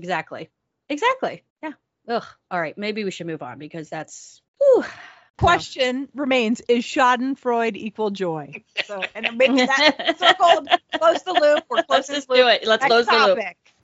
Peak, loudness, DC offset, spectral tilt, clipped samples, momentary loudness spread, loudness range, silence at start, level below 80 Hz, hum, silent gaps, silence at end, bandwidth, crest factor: -2 dBFS; -19 LUFS; under 0.1%; -1.5 dB/octave; under 0.1%; 17 LU; 10 LU; 0 s; -52 dBFS; none; 1.50-1.56 s, 4.48-4.54 s, 5.30-5.34 s; 0.3 s; 8 kHz; 20 dB